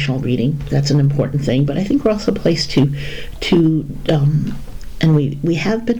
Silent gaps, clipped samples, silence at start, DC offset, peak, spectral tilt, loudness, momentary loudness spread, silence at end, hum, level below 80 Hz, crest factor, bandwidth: none; under 0.1%; 0 s; under 0.1%; -6 dBFS; -7 dB/octave; -17 LUFS; 8 LU; 0 s; none; -34 dBFS; 10 dB; 10 kHz